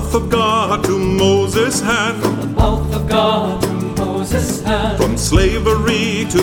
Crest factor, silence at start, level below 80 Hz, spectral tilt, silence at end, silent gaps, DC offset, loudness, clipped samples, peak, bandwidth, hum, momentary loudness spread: 14 dB; 0 s; -24 dBFS; -5 dB/octave; 0 s; none; under 0.1%; -16 LUFS; under 0.1%; 0 dBFS; 19.5 kHz; none; 5 LU